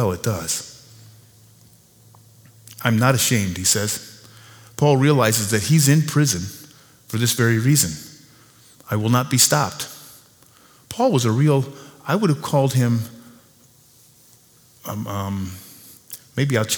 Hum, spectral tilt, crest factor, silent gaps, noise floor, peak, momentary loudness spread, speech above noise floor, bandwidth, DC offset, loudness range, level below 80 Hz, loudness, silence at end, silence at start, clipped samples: none; -4.5 dB/octave; 22 dB; none; -53 dBFS; 0 dBFS; 19 LU; 34 dB; over 20 kHz; under 0.1%; 7 LU; -56 dBFS; -19 LUFS; 0 s; 0 s; under 0.1%